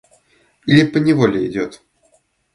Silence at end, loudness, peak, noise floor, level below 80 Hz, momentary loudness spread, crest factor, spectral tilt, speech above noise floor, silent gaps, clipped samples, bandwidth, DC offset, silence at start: 0.8 s; -16 LUFS; 0 dBFS; -60 dBFS; -54 dBFS; 14 LU; 18 dB; -7 dB/octave; 45 dB; none; under 0.1%; 11 kHz; under 0.1%; 0.65 s